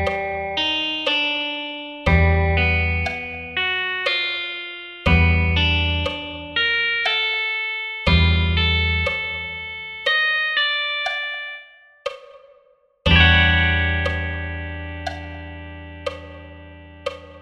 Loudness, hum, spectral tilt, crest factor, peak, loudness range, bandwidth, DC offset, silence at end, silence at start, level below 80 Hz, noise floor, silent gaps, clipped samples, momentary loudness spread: -19 LUFS; none; -6 dB/octave; 20 dB; -2 dBFS; 3 LU; 7 kHz; under 0.1%; 0 s; 0 s; -30 dBFS; -57 dBFS; none; under 0.1%; 15 LU